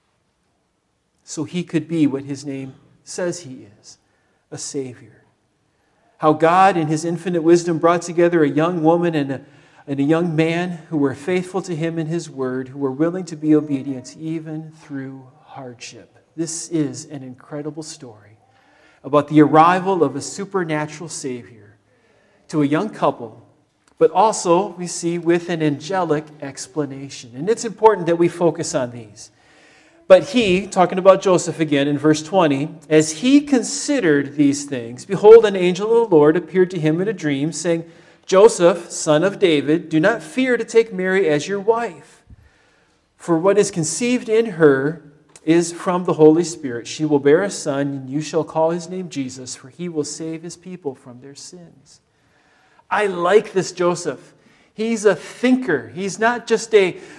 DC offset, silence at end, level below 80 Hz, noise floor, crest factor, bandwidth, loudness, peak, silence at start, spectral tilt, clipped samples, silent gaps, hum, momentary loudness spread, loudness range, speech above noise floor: under 0.1%; 0.05 s; -62 dBFS; -68 dBFS; 18 dB; 12 kHz; -18 LUFS; 0 dBFS; 1.3 s; -5.5 dB/octave; under 0.1%; none; none; 18 LU; 13 LU; 50 dB